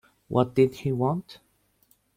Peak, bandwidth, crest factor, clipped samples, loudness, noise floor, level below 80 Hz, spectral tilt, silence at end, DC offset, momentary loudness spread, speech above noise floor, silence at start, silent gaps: -8 dBFS; 16 kHz; 20 dB; under 0.1%; -26 LUFS; -66 dBFS; -60 dBFS; -8.5 dB/octave; 0.85 s; under 0.1%; 6 LU; 41 dB; 0.3 s; none